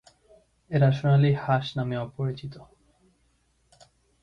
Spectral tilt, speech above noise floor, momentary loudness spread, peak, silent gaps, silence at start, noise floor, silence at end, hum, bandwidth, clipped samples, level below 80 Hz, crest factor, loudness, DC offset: -8.5 dB/octave; 44 dB; 11 LU; -10 dBFS; none; 0.7 s; -68 dBFS; 1.6 s; none; 6.2 kHz; under 0.1%; -58 dBFS; 18 dB; -25 LUFS; under 0.1%